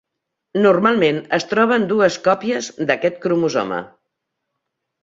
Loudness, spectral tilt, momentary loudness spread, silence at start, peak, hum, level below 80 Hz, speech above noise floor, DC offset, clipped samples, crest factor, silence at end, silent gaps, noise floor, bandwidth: -18 LUFS; -5 dB/octave; 8 LU; 0.55 s; -2 dBFS; none; -62 dBFS; 61 dB; under 0.1%; under 0.1%; 18 dB; 1.15 s; none; -79 dBFS; 7.8 kHz